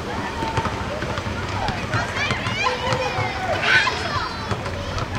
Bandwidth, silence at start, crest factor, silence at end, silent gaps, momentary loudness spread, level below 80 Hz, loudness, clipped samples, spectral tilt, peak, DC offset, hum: 16 kHz; 0 s; 20 dB; 0 s; none; 9 LU; -38 dBFS; -23 LUFS; under 0.1%; -4.5 dB/octave; -2 dBFS; under 0.1%; none